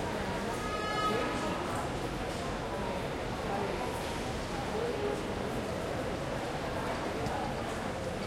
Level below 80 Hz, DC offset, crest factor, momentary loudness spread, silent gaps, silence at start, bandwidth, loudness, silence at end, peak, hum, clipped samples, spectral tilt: -48 dBFS; under 0.1%; 14 dB; 4 LU; none; 0 s; 16.5 kHz; -35 LUFS; 0 s; -20 dBFS; none; under 0.1%; -5 dB/octave